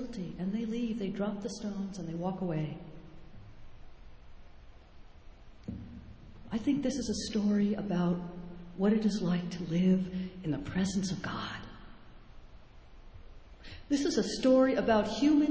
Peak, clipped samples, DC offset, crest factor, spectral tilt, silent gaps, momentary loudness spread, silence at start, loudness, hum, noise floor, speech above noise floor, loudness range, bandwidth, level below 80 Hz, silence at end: -16 dBFS; under 0.1%; under 0.1%; 18 dB; -6 dB/octave; none; 21 LU; 0 s; -32 LUFS; none; -52 dBFS; 21 dB; 12 LU; 8 kHz; -54 dBFS; 0 s